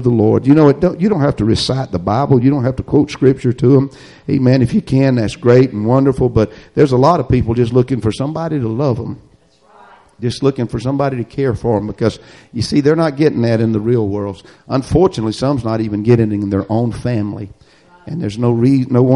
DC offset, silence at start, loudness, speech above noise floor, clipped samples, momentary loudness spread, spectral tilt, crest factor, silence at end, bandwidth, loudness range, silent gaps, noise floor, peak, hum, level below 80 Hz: under 0.1%; 0 s; -15 LUFS; 36 dB; under 0.1%; 11 LU; -8 dB/octave; 14 dB; 0 s; 11 kHz; 6 LU; none; -49 dBFS; 0 dBFS; none; -38 dBFS